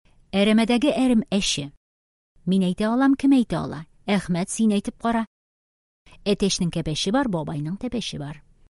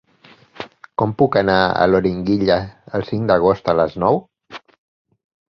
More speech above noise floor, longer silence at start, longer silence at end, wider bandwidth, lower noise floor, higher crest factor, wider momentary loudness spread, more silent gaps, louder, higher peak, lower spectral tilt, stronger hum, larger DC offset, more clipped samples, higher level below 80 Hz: first, over 68 dB vs 33 dB; second, 0.35 s vs 0.6 s; second, 0.3 s vs 1 s; first, 11.5 kHz vs 6.6 kHz; first, under -90 dBFS vs -50 dBFS; about the same, 14 dB vs 18 dB; second, 12 LU vs 20 LU; first, 1.77-2.35 s, 5.27-6.05 s vs none; second, -23 LUFS vs -18 LUFS; second, -8 dBFS vs -2 dBFS; second, -5 dB/octave vs -8 dB/octave; neither; neither; neither; about the same, -48 dBFS vs -46 dBFS